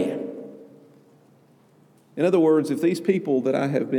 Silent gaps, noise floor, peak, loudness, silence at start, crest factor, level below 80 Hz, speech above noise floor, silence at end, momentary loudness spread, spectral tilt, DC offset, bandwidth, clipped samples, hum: none; -56 dBFS; -8 dBFS; -22 LUFS; 0 s; 16 dB; -86 dBFS; 36 dB; 0 s; 20 LU; -7 dB/octave; under 0.1%; 15 kHz; under 0.1%; none